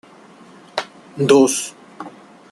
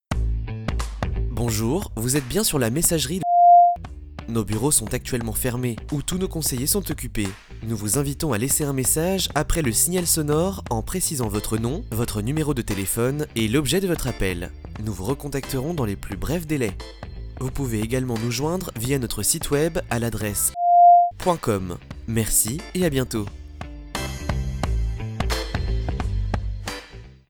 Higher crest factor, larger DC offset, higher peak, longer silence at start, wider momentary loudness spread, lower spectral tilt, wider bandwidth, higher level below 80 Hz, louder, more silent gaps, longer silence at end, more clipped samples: about the same, 20 dB vs 18 dB; neither; about the same, -2 dBFS vs -4 dBFS; first, 0.75 s vs 0.1 s; first, 23 LU vs 12 LU; about the same, -4 dB/octave vs -4.5 dB/octave; second, 12.5 kHz vs over 20 kHz; second, -66 dBFS vs -32 dBFS; first, -17 LUFS vs -22 LUFS; neither; first, 0.45 s vs 0.2 s; neither